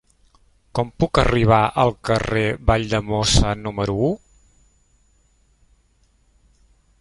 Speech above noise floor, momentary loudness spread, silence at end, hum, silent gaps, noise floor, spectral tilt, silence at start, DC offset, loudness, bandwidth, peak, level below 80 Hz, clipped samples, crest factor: 41 dB; 9 LU; 2.85 s; none; none; -60 dBFS; -5 dB/octave; 0.75 s; under 0.1%; -20 LUFS; 11.5 kHz; -2 dBFS; -32 dBFS; under 0.1%; 20 dB